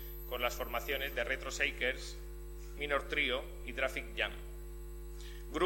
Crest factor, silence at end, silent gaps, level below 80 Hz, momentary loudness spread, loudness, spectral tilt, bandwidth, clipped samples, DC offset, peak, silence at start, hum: 22 dB; 0 s; none; -46 dBFS; 16 LU; -36 LUFS; -3.5 dB/octave; 16.5 kHz; under 0.1%; under 0.1%; -16 dBFS; 0 s; none